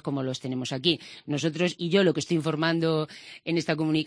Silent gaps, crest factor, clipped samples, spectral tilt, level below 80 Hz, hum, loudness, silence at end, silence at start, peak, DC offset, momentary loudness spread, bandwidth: none; 18 dB; under 0.1%; -5.5 dB/octave; -68 dBFS; none; -27 LUFS; 0 s; 0.05 s; -8 dBFS; under 0.1%; 8 LU; 10.5 kHz